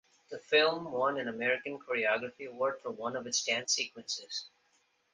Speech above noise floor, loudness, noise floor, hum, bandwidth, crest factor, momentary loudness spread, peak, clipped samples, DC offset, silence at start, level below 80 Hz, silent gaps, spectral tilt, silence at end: 40 dB; -32 LUFS; -73 dBFS; none; 10 kHz; 22 dB; 13 LU; -12 dBFS; under 0.1%; under 0.1%; 0.3 s; -78 dBFS; none; -1.5 dB/octave; 0.65 s